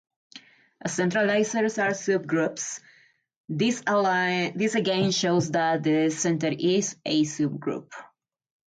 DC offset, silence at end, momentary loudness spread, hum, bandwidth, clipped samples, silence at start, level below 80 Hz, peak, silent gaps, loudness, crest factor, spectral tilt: under 0.1%; 0.6 s; 10 LU; none; 9.4 kHz; under 0.1%; 0.35 s; -70 dBFS; -12 dBFS; 3.36-3.44 s; -25 LUFS; 14 dB; -4.5 dB/octave